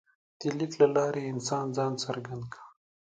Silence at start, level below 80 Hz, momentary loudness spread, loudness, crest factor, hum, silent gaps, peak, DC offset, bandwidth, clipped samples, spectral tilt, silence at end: 0.4 s; -72 dBFS; 16 LU; -30 LUFS; 20 dB; none; none; -10 dBFS; under 0.1%; 9.2 kHz; under 0.1%; -5.5 dB/octave; 0.45 s